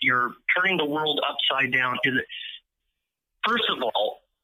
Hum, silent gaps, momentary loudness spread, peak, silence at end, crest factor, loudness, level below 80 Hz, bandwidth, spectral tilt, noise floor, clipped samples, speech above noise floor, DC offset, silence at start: none; none; 8 LU; -8 dBFS; 0.25 s; 18 dB; -23 LUFS; -72 dBFS; 15.5 kHz; -5 dB/octave; -81 dBFS; under 0.1%; 57 dB; under 0.1%; 0 s